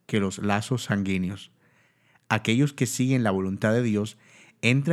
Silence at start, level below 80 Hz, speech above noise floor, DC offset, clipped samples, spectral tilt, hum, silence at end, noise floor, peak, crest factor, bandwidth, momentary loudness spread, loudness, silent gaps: 0.1 s; -68 dBFS; 39 dB; under 0.1%; under 0.1%; -5.5 dB/octave; none; 0 s; -63 dBFS; -4 dBFS; 22 dB; 14 kHz; 6 LU; -25 LUFS; none